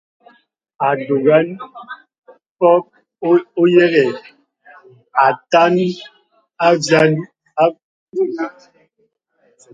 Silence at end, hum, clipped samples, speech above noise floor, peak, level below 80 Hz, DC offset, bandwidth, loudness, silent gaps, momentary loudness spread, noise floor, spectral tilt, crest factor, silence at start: 1.25 s; none; under 0.1%; 50 dB; 0 dBFS; -66 dBFS; under 0.1%; 9 kHz; -15 LUFS; 2.18-2.22 s, 2.49-2.56 s, 7.84-8.07 s; 17 LU; -64 dBFS; -6 dB/octave; 18 dB; 0.8 s